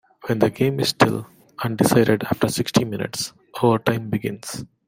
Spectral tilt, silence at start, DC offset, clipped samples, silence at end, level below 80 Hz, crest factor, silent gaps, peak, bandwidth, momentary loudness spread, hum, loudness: -5 dB/octave; 0.25 s; under 0.1%; under 0.1%; 0.2 s; -54 dBFS; 20 dB; none; -2 dBFS; 16.5 kHz; 12 LU; none; -21 LUFS